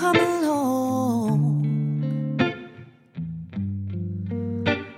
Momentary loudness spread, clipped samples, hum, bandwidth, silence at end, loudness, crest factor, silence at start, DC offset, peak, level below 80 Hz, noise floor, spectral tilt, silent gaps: 12 LU; under 0.1%; none; 16 kHz; 0 s; -25 LUFS; 18 dB; 0 s; under 0.1%; -6 dBFS; -60 dBFS; -46 dBFS; -6.5 dB/octave; none